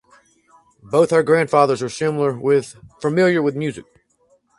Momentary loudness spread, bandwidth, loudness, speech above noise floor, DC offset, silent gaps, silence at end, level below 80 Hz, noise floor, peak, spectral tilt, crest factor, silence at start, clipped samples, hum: 11 LU; 11.5 kHz; -18 LUFS; 43 dB; under 0.1%; none; 0.75 s; -60 dBFS; -60 dBFS; 0 dBFS; -6 dB/octave; 18 dB; 0.85 s; under 0.1%; none